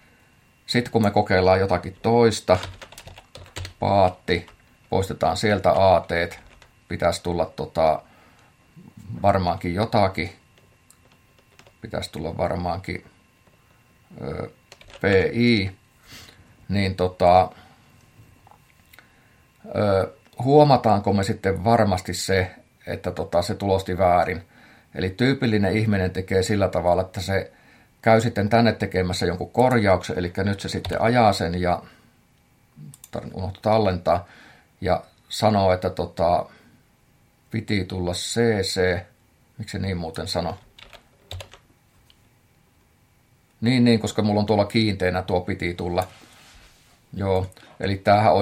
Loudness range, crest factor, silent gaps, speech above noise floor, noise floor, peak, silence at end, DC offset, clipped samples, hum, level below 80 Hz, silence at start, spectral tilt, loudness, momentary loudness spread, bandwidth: 7 LU; 20 dB; none; 38 dB; -60 dBFS; -2 dBFS; 0 s; under 0.1%; under 0.1%; none; -54 dBFS; 0.7 s; -6 dB/octave; -22 LUFS; 16 LU; 16 kHz